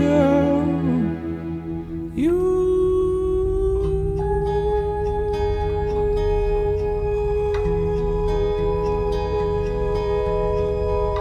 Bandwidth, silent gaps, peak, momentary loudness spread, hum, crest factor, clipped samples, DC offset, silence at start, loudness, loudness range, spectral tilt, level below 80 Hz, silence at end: 9.6 kHz; none; -6 dBFS; 4 LU; none; 14 dB; under 0.1%; under 0.1%; 0 s; -22 LUFS; 1 LU; -8.5 dB/octave; -28 dBFS; 0 s